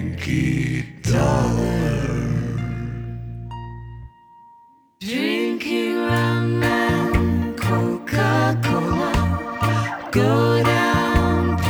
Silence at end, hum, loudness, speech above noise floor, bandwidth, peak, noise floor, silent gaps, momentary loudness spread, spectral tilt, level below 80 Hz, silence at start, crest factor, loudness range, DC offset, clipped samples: 0 s; none; -20 LUFS; 33 dB; over 20 kHz; -4 dBFS; -52 dBFS; none; 14 LU; -6.5 dB/octave; -34 dBFS; 0 s; 16 dB; 8 LU; under 0.1%; under 0.1%